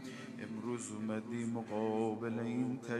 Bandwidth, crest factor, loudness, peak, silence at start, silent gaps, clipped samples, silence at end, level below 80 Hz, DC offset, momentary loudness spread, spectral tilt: 12 kHz; 16 dB; -39 LUFS; -22 dBFS; 0 s; none; under 0.1%; 0 s; -80 dBFS; under 0.1%; 8 LU; -6 dB/octave